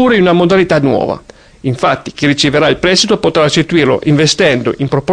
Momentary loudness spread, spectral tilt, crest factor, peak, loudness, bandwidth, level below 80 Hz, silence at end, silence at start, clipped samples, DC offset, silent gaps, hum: 6 LU; -5 dB/octave; 10 dB; 0 dBFS; -11 LUFS; 10.5 kHz; -40 dBFS; 0 s; 0 s; under 0.1%; under 0.1%; none; none